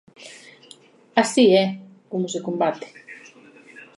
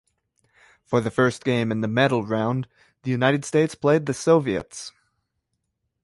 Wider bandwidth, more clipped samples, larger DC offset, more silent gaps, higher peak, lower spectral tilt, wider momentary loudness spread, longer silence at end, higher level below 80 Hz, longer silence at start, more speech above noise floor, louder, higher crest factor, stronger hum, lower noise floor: about the same, 11.5 kHz vs 11.5 kHz; neither; neither; neither; first, -2 dBFS vs -6 dBFS; second, -4.5 dB/octave vs -6 dB/octave; first, 26 LU vs 13 LU; second, 0.15 s vs 1.15 s; second, -74 dBFS vs -58 dBFS; second, 0.2 s vs 0.9 s; second, 30 dB vs 55 dB; about the same, -21 LUFS vs -22 LUFS; about the same, 20 dB vs 18 dB; neither; second, -50 dBFS vs -77 dBFS